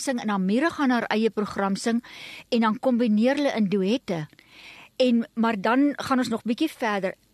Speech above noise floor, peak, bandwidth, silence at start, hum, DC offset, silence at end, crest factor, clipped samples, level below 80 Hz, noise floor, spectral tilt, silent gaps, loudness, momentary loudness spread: 24 dB; -8 dBFS; 13 kHz; 0 s; none; under 0.1%; 0.2 s; 16 dB; under 0.1%; -66 dBFS; -48 dBFS; -5.5 dB/octave; none; -24 LUFS; 8 LU